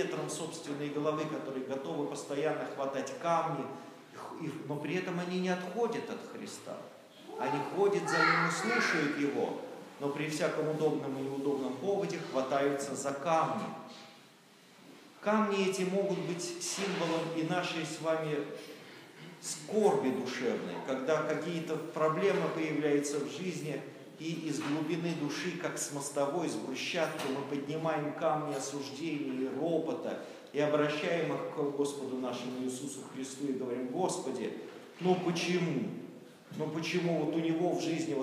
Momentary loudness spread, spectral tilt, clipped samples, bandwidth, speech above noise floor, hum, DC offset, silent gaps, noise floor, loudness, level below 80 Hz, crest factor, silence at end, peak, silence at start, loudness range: 13 LU; -5 dB/octave; under 0.1%; 15.5 kHz; 26 dB; none; under 0.1%; none; -59 dBFS; -34 LUFS; -90 dBFS; 18 dB; 0 s; -16 dBFS; 0 s; 5 LU